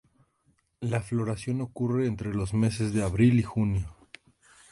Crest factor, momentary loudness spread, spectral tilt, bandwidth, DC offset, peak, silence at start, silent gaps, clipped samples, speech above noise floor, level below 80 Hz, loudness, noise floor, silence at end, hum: 18 dB; 10 LU; -7.5 dB/octave; 11.5 kHz; under 0.1%; -10 dBFS; 0.8 s; none; under 0.1%; 44 dB; -46 dBFS; -28 LUFS; -70 dBFS; 0.8 s; none